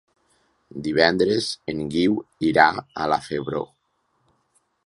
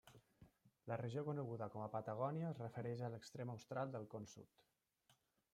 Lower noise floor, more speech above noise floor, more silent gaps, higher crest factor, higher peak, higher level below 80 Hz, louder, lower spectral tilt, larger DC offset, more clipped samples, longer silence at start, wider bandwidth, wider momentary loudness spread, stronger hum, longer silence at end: second, -70 dBFS vs -80 dBFS; first, 48 dB vs 33 dB; neither; about the same, 24 dB vs 20 dB; first, 0 dBFS vs -30 dBFS; first, -56 dBFS vs -84 dBFS; first, -22 LUFS vs -48 LUFS; second, -5 dB/octave vs -7.5 dB/octave; neither; neither; first, 0.75 s vs 0.05 s; second, 11.5 kHz vs 14 kHz; first, 13 LU vs 9 LU; neither; first, 1.2 s vs 0.4 s